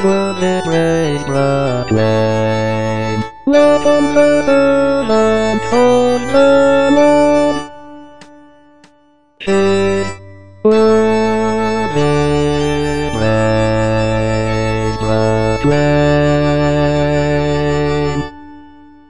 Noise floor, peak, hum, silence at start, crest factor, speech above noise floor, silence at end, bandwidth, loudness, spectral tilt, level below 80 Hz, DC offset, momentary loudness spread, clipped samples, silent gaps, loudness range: -52 dBFS; 0 dBFS; none; 0 s; 14 dB; 38 dB; 0 s; 10.5 kHz; -13 LUFS; -6.5 dB/octave; -34 dBFS; 4%; 7 LU; under 0.1%; none; 4 LU